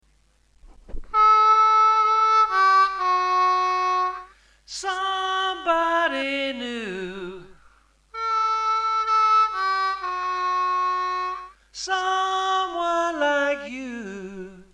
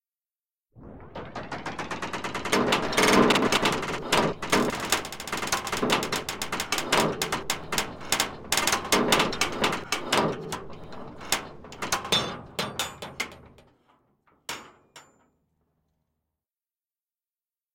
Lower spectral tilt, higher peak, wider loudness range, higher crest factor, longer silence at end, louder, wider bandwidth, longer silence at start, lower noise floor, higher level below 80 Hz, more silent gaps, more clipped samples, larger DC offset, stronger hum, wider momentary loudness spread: about the same, -2.5 dB/octave vs -2.5 dB/octave; second, -8 dBFS vs -4 dBFS; second, 7 LU vs 17 LU; second, 16 dB vs 24 dB; second, 0.1 s vs 2.75 s; first, -21 LUFS vs -26 LUFS; second, 10 kHz vs 17 kHz; about the same, 0.65 s vs 0.75 s; second, -61 dBFS vs under -90 dBFS; about the same, -50 dBFS vs -54 dBFS; neither; neither; neither; neither; about the same, 17 LU vs 16 LU